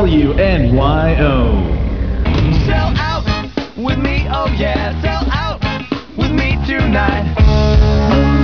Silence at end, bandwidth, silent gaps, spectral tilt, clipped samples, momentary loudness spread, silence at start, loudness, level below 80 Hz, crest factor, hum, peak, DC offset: 0 s; 5.4 kHz; none; -7.5 dB/octave; under 0.1%; 7 LU; 0 s; -15 LUFS; -18 dBFS; 14 dB; none; 0 dBFS; 0.9%